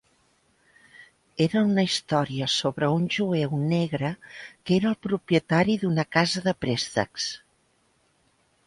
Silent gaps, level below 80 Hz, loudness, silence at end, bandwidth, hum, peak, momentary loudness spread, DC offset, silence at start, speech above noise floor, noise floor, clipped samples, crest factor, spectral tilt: none; -60 dBFS; -25 LUFS; 1.3 s; 11.5 kHz; none; -6 dBFS; 9 LU; under 0.1%; 1 s; 42 dB; -67 dBFS; under 0.1%; 20 dB; -5.5 dB/octave